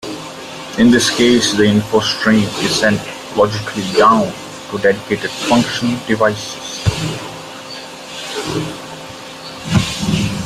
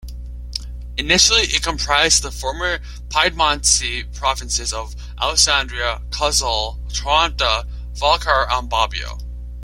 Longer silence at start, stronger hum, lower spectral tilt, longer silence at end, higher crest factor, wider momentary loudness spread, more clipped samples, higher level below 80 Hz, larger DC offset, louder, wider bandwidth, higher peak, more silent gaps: about the same, 0 s vs 0 s; second, none vs 60 Hz at -30 dBFS; first, -4.5 dB/octave vs -1 dB/octave; about the same, 0 s vs 0 s; about the same, 16 dB vs 20 dB; about the same, 17 LU vs 15 LU; neither; second, -44 dBFS vs -30 dBFS; neither; about the same, -15 LUFS vs -17 LUFS; about the same, 15 kHz vs 16.5 kHz; about the same, 0 dBFS vs 0 dBFS; neither